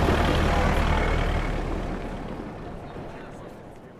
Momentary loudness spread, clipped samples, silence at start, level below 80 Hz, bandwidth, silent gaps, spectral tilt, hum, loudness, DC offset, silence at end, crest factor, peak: 18 LU; under 0.1%; 0 s; -30 dBFS; 13.5 kHz; none; -6 dB/octave; none; -26 LUFS; under 0.1%; 0 s; 18 dB; -8 dBFS